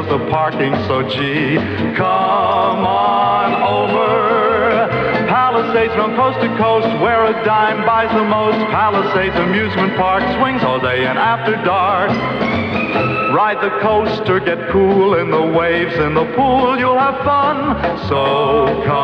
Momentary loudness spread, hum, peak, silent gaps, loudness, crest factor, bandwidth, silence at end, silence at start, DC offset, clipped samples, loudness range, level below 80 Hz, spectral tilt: 3 LU; none; -2 dBFS; none; -15 LUFS; 12 dB; 8.2 kHz; 0 s; 0 s; under 0.1%; under 0.1%; 1 LU; -42 dBFS; -7.5 dB/octave